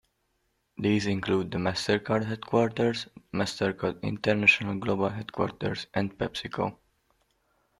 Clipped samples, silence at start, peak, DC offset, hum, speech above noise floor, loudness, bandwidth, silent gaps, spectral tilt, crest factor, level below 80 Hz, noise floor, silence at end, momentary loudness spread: under 0.1%; 0.8 s; -6 dBFS; under 0.1%; none; 47 dB; -28 LUFS; 12.5 kHz; none; -5.5 dB/octave; 22 dB; -60 dBFS; -75 dBFS; 1.05 s; 11 LU